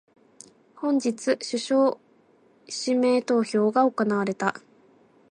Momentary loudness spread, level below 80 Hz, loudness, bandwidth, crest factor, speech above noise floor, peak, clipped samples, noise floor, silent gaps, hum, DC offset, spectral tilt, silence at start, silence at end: 8 LU; -78 dBFS; -24 LUFS; 11 kHz; 18 dB; 36 dB; -8 dBFS; under 0.1%; -60 dBFS; none; none; under 0.1%; -4.5 dB/octave; 0.8 s; 0.75 s